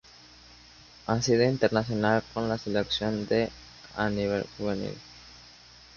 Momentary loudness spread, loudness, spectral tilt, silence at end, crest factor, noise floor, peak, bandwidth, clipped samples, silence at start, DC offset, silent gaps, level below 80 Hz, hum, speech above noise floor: 23 LU; -28 LUFS; -5.5 dB/octave; 0.5 s; 20 dB; -52 dBFS; -8 dBFS; 7.2 kHz; under 0.1%; 0.5 s; under 0.1%; none; -54 dBFS; 60 Hz at -55 dBFS; 25 dB